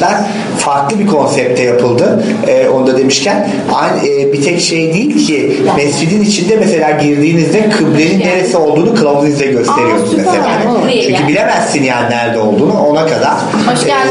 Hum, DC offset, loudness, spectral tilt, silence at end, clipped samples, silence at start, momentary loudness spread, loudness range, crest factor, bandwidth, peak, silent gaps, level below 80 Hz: none; under 0.1%; -10 LUFS; -5 dB/octave; 0 s; under 0.1%; 0 s; 2 LU; 1 LU; 10 dB; 11 kHz; 0 dBFS; none; -50 dBFS